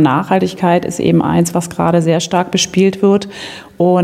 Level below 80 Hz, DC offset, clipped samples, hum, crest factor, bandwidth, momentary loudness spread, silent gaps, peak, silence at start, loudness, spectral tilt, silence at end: -48 dBFS; under 0.1%; under 0.1%; none; 12 dB; 15 kHz; 4 LU; none; 0 dBFS; 0 s; -14 LUFS; -5.5 dB/octave; 0 s